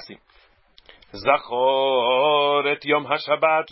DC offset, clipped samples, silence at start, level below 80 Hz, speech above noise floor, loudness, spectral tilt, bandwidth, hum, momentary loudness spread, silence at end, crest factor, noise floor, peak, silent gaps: under 0.1%; under 0.1%; 0 s; -62 dBFS; 37 dB; -20 LUFS; -8 dB/octave; 5.8 kHz; none; 4 LU; 0 s; 18 dB; -57 dBFS; -4 dBFS; none